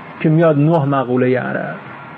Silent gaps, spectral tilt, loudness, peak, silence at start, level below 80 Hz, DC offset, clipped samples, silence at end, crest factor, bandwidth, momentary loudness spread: none; -10.5 dB/octave; -15 LUFS; -4 dBFS; 0 s; -62 dBFS; under 0.1%; under 0.1%; 0 s; 12 dB; 4.3 kHz; 12 LU